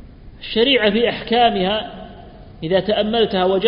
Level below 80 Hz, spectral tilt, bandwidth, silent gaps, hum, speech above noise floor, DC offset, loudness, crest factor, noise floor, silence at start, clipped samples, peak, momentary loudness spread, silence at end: -42 dBFS; -10 dB/octave; 5.4 kHz; none; none; 22 dB; under 0.1%; -17 LUFS; 18 dB; -39 dBFS; 0 s; under 0.1%; -2 dBFS; 19 LU; 0 s